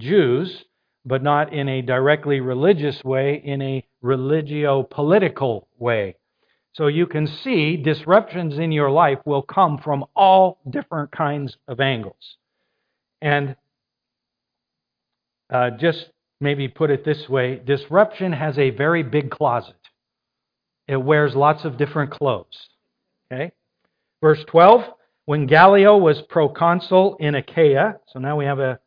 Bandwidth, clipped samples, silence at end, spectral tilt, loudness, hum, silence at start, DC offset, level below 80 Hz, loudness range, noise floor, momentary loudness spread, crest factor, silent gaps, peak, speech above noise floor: 5.2 kHz; under 0.1%; 0.1 s; -9.5 dB/octave; -19 LUFS; none; 0 s; under 0.1%; -64 dBFS; 10 LU; -83 dBFS; 13 LU; 20 dB; none; 0 dBFS; 65 dB